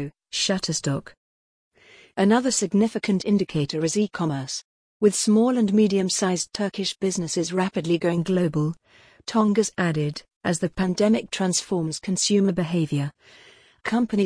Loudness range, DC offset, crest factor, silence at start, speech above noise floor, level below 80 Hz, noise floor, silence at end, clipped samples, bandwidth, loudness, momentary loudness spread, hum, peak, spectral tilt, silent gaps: 2 LU; under 0.1%; 18 dB; 0 s; over 67 dB; -56 dBFS; under -90 dBFS; 0 s; under 0.1%; 10.5 kHz; -23 LUFS; 9 LU; none; -6 dBFS; -5 dB/octave; 1.17-1.71 s, 4.64-5.00 s, 10.36-10.41 s